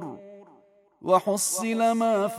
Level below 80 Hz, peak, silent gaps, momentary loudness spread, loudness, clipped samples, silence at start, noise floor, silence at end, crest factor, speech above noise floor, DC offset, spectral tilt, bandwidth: -78 dBFS; -8 dBFS; none; 17 LU; -24 LUFS; under 0.1%; 0 s; -59 dBFS; 0 s; 18 dB; 35 dB; under 0.1%; -3.5 dB/octave; 16 kHz